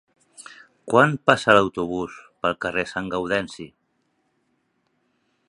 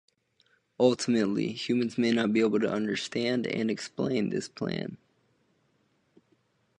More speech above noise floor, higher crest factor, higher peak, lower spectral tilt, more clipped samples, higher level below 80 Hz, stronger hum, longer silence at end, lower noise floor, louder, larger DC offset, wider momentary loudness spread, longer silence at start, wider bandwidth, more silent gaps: first, 49 dB vs 43 dB; about the same, 24 dB vs 20 dB; first, 0 dBFS vs -10 dBFS; about the same, -5 dB/octave vs -5.5 dB/octave; neither; first, -56 dBFS vs -70 dBFS; neither; about the same, 1.8 s vs 1.85 s; about the same, -70 dBFS vs -71 dBFS; first, -21 LUFS vs -28 LUFS; neither; first, 24 LU vs 8 LU; second, 0.4 s vs 0.8 s; about the same, 11.5 kHz vs 10.5 kHz; neither